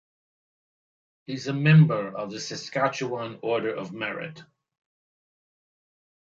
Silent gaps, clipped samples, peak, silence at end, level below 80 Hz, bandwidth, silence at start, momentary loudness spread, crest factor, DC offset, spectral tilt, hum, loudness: none; under 0.1%; -6 dBFS; 1.95 s; -70 dBFS; 7.4 kHz; 1.3 s; 16 LU; 20 dB; under 0.1%; -6.5 dB/octave; none; -25 LUFS